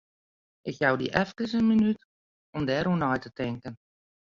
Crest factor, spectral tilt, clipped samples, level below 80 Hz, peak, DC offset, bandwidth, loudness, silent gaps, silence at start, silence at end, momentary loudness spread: 24 dB; -7 dB/octave; under 0.1%; -58 dBFS; -6 dBFS; under 0.1%; 7.2 kHz; -27 LUFS; 2.05-2.53 s; 0.65 s; 0.55 s; 16 LU